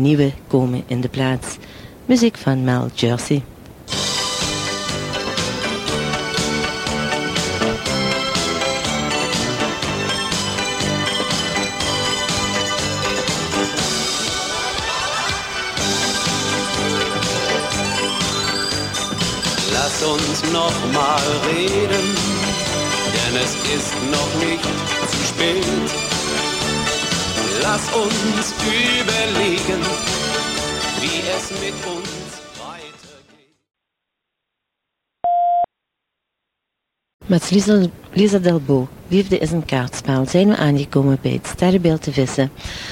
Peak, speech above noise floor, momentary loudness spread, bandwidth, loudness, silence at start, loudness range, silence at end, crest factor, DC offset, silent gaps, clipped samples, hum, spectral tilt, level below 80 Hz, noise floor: -2 dBFS; 62 dB; 6 LU; 16.5 kHz; -19 LUFS; 0 s; 6 LU; 0 s; 18 dB; under 0.1%; 37.14-37.19 s; under 0.1%; none; -3.5 dB/octave; -42 dBFS; -80 dBFS